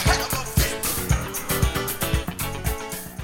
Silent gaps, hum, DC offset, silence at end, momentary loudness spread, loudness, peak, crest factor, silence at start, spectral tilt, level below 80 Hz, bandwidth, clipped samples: none; none; under 0.1%; 0 s; 6 LU; -24 LUFS; -6 dBFS; 20 dB; 0 s; -3.5 dB/octave; -30 dBFS; 19 kHz; under 0.1%